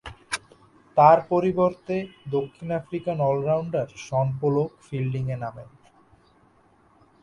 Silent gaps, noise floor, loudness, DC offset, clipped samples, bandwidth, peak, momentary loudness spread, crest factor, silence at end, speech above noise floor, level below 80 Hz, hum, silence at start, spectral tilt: none; -59 dBFS; -24 LUFS; under 0.1%; under 0.1%; 11.5 kHz; -2 dBFS; 15 LU; 22 dB; 1.6 s; 36 dB; -58 dBFS; none; 0.05 s; -7 dB/octave